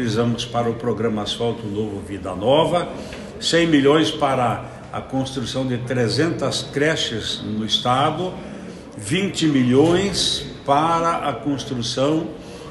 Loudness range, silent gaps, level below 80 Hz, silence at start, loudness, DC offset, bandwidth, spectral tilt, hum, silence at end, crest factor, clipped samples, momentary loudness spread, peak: 3 LU; none; -46 dBFS; 0 s; -20 LUFS; under 0.1%; 12.5 kHz; -5 dB/octave; none; 0 s; 18 dB; under 0.1%; 13 LU; -2 dBFS